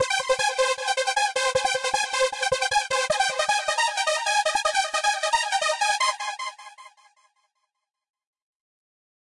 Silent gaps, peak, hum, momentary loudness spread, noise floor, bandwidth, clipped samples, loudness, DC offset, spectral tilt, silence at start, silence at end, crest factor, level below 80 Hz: none; -10 dBFS; none; 2 LU; -80 dBFS; 11.5 kHz; under 0.1%; -23 LUFS; under 0.1%; 1 dB/octave; 0 s; 2.4 s; 16 dB; -62 dBFS